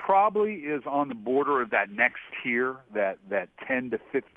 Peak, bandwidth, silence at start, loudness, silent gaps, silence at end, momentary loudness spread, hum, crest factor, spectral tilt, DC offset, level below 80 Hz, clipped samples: -6 dBFS; 3.8 kHz; 0 s; -27 LUFS; none; 0.15 s; 8 LU; none; 20 dB; -8 dB/octave; under 0.1%; -72 dBFS; under 0.1%